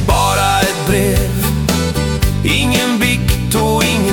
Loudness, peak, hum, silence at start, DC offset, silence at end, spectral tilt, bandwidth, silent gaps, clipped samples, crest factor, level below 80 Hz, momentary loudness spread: -14 LUFS; 0 dBFS; none; 0 s; under 0.1%; 0 s; -4.5 dB/octave; 19 kHz; none; under 0.1%; 12 dB; -22 dBFS; 3 LU